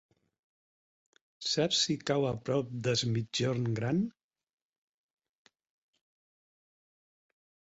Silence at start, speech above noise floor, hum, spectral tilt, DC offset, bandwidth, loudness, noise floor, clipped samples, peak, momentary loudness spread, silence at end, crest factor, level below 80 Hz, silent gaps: 1.4 s; over 59 dB; none; -4.5 dB/octave; under 0.1%; 8.2 kHz; -31 LUFS; under -90 dBFS; under 0.1%; -16 dBFS; 5 LU; 3.65 s; 20 dB; -68 dBFS; none